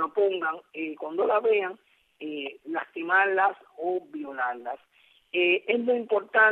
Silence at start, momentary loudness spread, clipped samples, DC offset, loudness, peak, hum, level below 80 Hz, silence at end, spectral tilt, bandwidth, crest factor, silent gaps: 0 s; 13 LU; under 0.1%; under 0.1%; -27 LUFS; -8 dBFS; none; -86 dBFS; 0 s; -6 dB/octave; 4.2 kHz; 18 dB; none